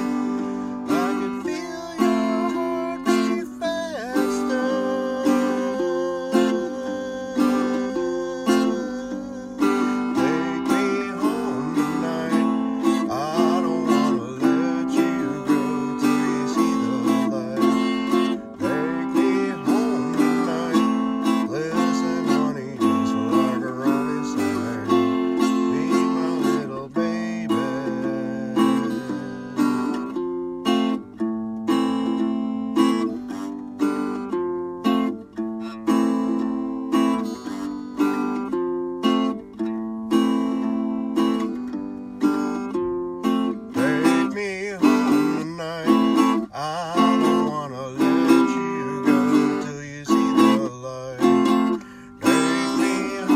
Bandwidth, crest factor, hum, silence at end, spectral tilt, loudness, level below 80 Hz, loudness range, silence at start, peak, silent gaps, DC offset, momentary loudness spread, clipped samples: 15 kHz; 18 dB; none; 0 s; -5.5 dB/octave; -22 LUFS; -60 dBFS; 4 LU; 0 s; -4 dBFS; none; under 0.1%; 8 LU; under 0.1%